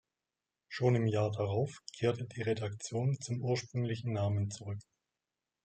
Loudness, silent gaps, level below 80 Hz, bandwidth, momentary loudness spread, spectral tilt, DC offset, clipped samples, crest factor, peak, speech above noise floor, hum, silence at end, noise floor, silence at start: -35 LUFS; none; -72 dBFS; 9 kHz; 8 LU; -6.5 dB/octave; under 0.1%; under 0.1%; 18 dB; -16 dBFS; over 56 dB; none; 0.8 s; under -90 dBFS; 0.7 s